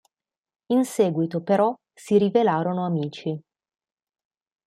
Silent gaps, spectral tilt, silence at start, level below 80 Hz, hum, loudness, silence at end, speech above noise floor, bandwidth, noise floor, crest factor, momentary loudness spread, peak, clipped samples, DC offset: none; -7 dB/octave; 0.7 s; -72 dBFS; none; -23 LUFS; 1.3 s; 61 dB; 14.5 kHz; -83 dBFS; 18 dB; 12 LU; -6 dBFS; under 0.1%; under 0.1%